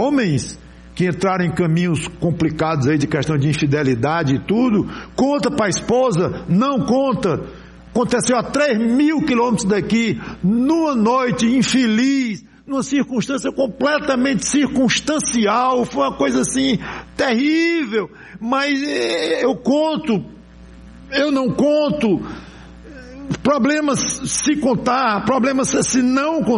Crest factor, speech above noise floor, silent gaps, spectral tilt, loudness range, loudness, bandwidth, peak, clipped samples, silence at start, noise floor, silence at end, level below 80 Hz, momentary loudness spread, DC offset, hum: 12 dB; 23 dB; none; -5 dB/octave; 2 LU; -18 LUFS; 11.5 kHz; -6 dBFS; under 0.1%; 0 s; -40 dBFS; 0 s; -46 dBFS; 7 LU; under 0.1%; none